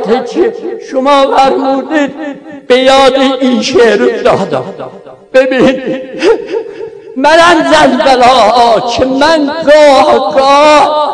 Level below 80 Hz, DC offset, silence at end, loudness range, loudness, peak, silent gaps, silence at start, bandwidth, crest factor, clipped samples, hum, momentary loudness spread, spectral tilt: -40 dBFS; under 0.1%; 0 s; 4 LU; -7 LUFS; 0 dBFS; none; 0 s; 11 kHz; 8 dB; 5%; none; 14 LU; -4 dB/octave